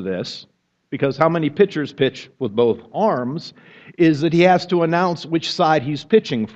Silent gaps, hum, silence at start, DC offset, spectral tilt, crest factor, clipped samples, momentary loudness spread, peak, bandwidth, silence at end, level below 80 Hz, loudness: none; none; 0 s; under 0.1%; -6.5 dB/octave; 18 dB; under 0.1%; 12 LU; 0 dBFS; 8 kHz; 0.05 s; -60 dBFS; -19 LUFS